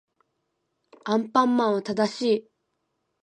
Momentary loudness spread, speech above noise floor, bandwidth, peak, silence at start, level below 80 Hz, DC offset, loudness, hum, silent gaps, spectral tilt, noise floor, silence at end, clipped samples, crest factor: 6 LU; 54 dB; 9.6 kHz; -6 dBFS; 1.05 s; -76 dBFS; under 0.1%; -24 LUFS; none; none; -5.5 dB/octave; -77 dBFS; 0.85 s; under 0.1%; 20 dB